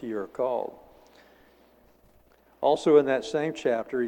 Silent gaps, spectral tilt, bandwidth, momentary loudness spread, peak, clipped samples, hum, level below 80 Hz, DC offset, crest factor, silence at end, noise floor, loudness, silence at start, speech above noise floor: none; -5.5 dB/octave; 9.8 kHz; 12 LU; -8 dBFS; under 0.1%; none; -66 dBFS; under 0.1%; 20 dB; 0 s; -60 dBFS; -26 LUFS; 0 s; 35 dB